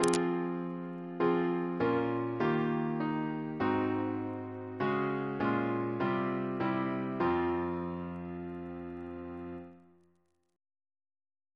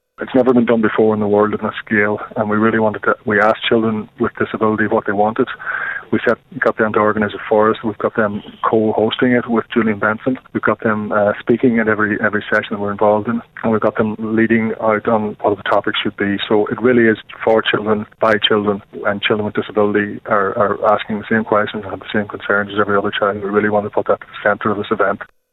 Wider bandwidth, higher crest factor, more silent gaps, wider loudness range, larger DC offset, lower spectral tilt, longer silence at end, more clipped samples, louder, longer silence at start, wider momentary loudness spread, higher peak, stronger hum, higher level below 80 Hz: first, 11 kHz vs 5.2 kHz; first, 24 dB vs 14 dB; neither; first, 10 LU vs 2 LU; neither; second, -6.5 dB/octave vs -8 dB/octave; first, 1.75 s vs 0.3 s; neither; second, -34 LUFS vs -16 LUFS; second, 0 s vs 0.2 s; first, 12 LU vs 6 LU; second, -10 dBFS vs -2 dBFS; neither; second, -66 dBFS vs -50 dBFS